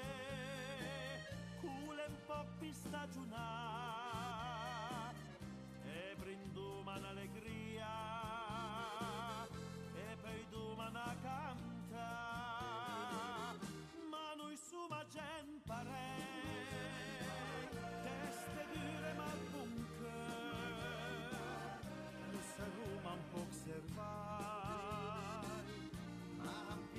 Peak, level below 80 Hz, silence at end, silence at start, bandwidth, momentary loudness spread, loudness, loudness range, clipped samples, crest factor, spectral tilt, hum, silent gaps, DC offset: -34 dBFS; -66 dBFS; 0 s; 0 s; 15 kHz; 5 LU; -48 LUFS; 2 LU; under 0.1%; 14 dB; -5 dB/octave; none; none; under 0.1%